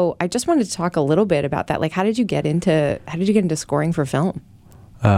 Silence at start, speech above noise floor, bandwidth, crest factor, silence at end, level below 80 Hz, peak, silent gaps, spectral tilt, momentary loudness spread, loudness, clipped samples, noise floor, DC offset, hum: 0 s; 25 dB; 15 kHz; 18 dB; 0 s; -48 dBFS; -2 dBFS; none; -6.5 dB/octave; 4 LU; -20 LUFS; under 0.1%; -45 dBFS; under 0.1%; none